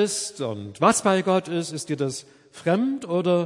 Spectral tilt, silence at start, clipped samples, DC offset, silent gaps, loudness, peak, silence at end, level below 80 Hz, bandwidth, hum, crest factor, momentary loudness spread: -4.5 dB/octave; 0 s; under 0.1%; under 0.1%; none; -24 LUFS; -4 dBFS; 0 s; -68 dBFS; 11.5 kHz; none; 20 dB; 10 LU